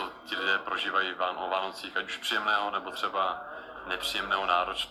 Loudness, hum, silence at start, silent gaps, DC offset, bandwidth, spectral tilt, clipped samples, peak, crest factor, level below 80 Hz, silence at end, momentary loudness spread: -30 LUFS; none; 0 s; none; under 0.1%; 15 kHz; -1.5 dB/octave; under 0.1%; -12 dBFS; 20 dB; -62 dBFS; 0 s; 8 LU